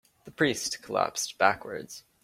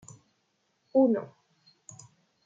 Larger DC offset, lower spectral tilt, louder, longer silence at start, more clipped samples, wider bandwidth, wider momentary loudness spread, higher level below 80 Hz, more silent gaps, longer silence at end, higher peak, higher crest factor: neither; second, -3 dB/octave vs -7 dB/octave; about the same, -28 LUFS vs -27 LUFS; second, 0.25 s vs 0.95 s; neither; first, 16.5 kHz vs 9.2 kHz; second, 14 LU vs 25 LU; first, -68 dBFS vs -80 dBFS; neither; second, 0.25 s vs 1.2 s; first, -6 dBFS vs -12 dBFS; about the same, 24 dB vs 20 dB